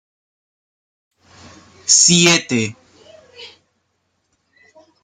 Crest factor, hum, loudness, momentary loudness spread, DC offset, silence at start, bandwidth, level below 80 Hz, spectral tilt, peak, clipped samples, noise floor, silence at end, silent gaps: 20 dB; none; -12 LUFS; 17 LU; under 0.1%; 1.85 s; 14.5 kHz; -60 dBFS; -2 dB/octave; 0 dBFS; under 0.1%; -69 dBFS; 1.55 s; none